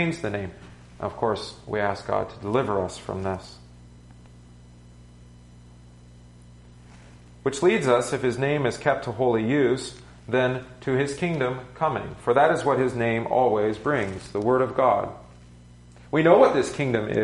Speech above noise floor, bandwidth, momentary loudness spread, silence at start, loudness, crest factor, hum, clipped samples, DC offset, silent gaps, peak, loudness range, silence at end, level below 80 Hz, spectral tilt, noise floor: 25 dB; 11.5 kHz; 11 LU; 0 s; -24 LUFS; 20 dB; 60 Hz at -50 dBFS; under 0.1%; under 0.1%; none; -4 dBFS; 9 LU; 0 s; -52 dBFS; -6 dB/octave; -48 dBFS